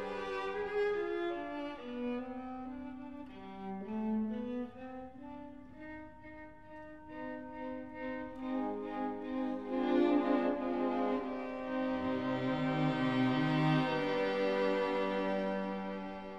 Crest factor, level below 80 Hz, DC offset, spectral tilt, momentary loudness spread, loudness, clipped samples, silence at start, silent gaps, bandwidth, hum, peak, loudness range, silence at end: 16 dB; -64 dBFS; 0.1%; -7.5 dB/octave; 18 LU; -36 LUFS; under 0.1%; 0 s; none; 7.8 kHz; none; -20 dBFS; 12 LU; 0 s